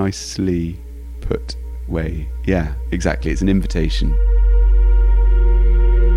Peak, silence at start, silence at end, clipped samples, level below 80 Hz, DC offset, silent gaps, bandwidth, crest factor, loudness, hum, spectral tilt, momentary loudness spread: -4 dBFS; 0 s; 0 s; under 0.1%; -16 dBFS; under 0.1%; none; 7.8 kHz; 12 dB; -19 LUFS; none; -6.5 dB/octave; 10 LU